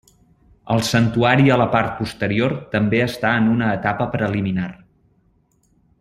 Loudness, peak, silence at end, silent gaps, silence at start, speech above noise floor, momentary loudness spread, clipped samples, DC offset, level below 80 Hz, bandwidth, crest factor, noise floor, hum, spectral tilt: -19 LUFS; -2 dBFS; 1.25 s; none; 0.65 s; 42 dB; 9 LU; under 0.1%; under 0.1%; -48 dBFS; 15 kHz; 18 dB; -61 dBFS; none; -6.5 dB/octave